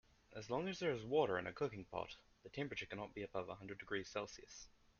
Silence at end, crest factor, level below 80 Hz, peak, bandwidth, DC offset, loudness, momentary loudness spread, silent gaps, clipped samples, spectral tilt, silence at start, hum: 0.3 s; 22 dB; -70 dBFS; -24 dBFS; 7 kHz; under 0.1%; -44 LUFS; 17 LU; none; under 0.1%; -4 dB/octave; 0.3 s; none